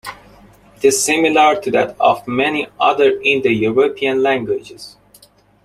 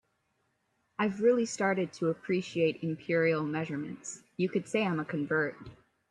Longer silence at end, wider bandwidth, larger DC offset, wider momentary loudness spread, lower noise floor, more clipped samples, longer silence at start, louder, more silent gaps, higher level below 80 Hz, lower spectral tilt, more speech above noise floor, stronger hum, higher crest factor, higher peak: first, 0.75 s vs 0.35 s; first, 15.5 kHz vs 10.5 kHz; neither; about the same, 9 LU vs 11 LU; second, -49 dBFS vs -77 dBFS; neither; second, 0.05 s vs 1 s; first, -15 LUFS vs -31 LUFS; neither; first, -54 dBFS vs -72 dBFS; second, -3 dB/octave vs -5.5 dB/octave; second, 34 dB vs 46 dB; neither; about the same, 14 dB vs 16 dB; first, -2 dBFS vs -16 dBFS